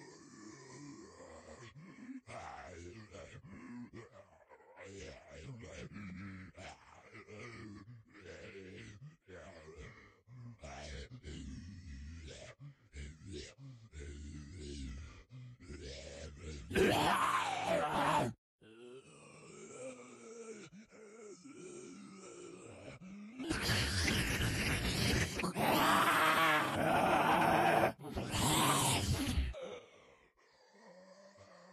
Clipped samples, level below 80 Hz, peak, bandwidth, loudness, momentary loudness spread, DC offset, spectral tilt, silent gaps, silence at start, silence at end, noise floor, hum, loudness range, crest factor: under 0.1%; -54 dBFS; -18 dBFS; 14 kHz; -33 LUFS; 25 LU; under 0.1%; -4 dB/octave; 18.38-18.59 s; 0 s; 0 s; -68 dBFS; none; 21 LU; 22 dB